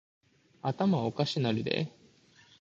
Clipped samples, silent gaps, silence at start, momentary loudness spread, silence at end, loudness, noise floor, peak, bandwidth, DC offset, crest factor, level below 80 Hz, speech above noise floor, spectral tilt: under 0.1%; none; 0.65 s; 8 LU; 0.7 s; -31 LUFS; -61 dBFS; -12 dBFS; 7.8 kHz; under 0.1%; 22 dB; -68 dBFS; 31 dB; -7 dB/octave